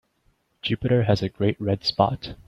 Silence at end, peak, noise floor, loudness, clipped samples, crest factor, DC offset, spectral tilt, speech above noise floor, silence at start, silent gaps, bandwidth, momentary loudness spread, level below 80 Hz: 0.15 s; -2 dBFS; -67 dBFS; -24 LUFS; under 0.1%; 22 dB; under 0.1%; -7.5 dB/octave; 44 dB; 0.65 s; none; 7.4 kHz; 6 LU; -50 dBFS